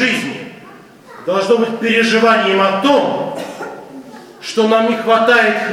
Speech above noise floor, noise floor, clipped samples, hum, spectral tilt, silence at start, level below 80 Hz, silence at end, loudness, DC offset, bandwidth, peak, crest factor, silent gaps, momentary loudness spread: 26 dB; -39 dBFS; under 0.1%; none; -4 dB/octave; 0 s; -64 dBFS; 0 s; -13 LUFS; under 0.1%; 15.5 kHz; 0 dBFS; 14 dB; none; 18 LU